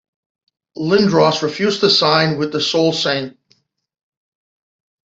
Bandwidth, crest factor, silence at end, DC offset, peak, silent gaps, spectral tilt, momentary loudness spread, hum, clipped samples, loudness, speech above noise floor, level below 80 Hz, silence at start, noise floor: 8 kHz; 16 dB; 1.75 s; under 0.1%; -2 dBFS; none; -4.5 dB/octave; 8 LU; none; under 0.1%; -15 LUFS; 45 dB; -60 dBFS; 0.75 s; -61 dBFS